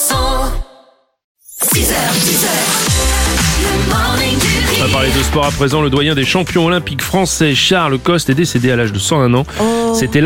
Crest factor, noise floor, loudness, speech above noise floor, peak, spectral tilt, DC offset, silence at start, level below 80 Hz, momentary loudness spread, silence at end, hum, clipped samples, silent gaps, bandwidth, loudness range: 14 dB; -48 dBFS; -13 LUFS; 35 dB; 0 dBFS; -3.5 dB/octave; under 0.1%; 0 s; -24 dBFS; 4 LU; 0 s; none; under 0.1%; 1.24-1.35 s; 17 kHz; 1 LU